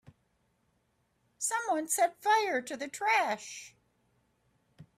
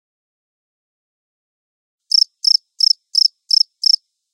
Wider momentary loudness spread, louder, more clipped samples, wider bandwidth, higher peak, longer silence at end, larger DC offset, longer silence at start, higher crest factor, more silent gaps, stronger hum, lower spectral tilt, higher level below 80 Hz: first, 11 LU vs 1 LU; second, -30 LUFS vs -13 LUFS; neither; about the same, 16 kHz vs 17 kHz; second, -16 dBFS vs -2 dBFS; second, 0.15 s vs 1.05 s; neither; second, 1.4 s vs 2.15 s; about the same, 18 dB vs 18 dB; neither; neither; first, -1 dB/octave vs 12.5 dB/octave; first, -80 dBFS vs under -90 dBFS